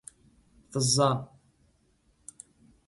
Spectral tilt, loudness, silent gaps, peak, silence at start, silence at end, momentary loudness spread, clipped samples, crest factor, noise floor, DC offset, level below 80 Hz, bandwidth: -4 dB/octave; -26 LUFS; none; -12 dBFS; 0.7 s; 1.65 s; 27 LU; under 0.1%; 22 dB; -68 dBFS; under 0.1%; -62 dBFS; 12 kHz